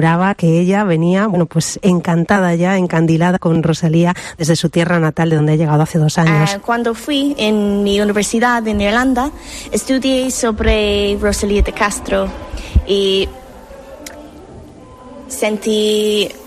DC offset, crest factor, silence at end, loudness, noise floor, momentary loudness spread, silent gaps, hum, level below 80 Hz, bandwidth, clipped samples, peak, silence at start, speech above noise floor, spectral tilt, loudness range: under 0.1%; 14 dB; 0 s; -15 LUFS; -37 dBFS; 6 LU; none; none; -28 dBFS; 14 kHz; under 0.1%; 0 dBFS; 0 s; 22 dB; -5.5 dB/octave; 6 LU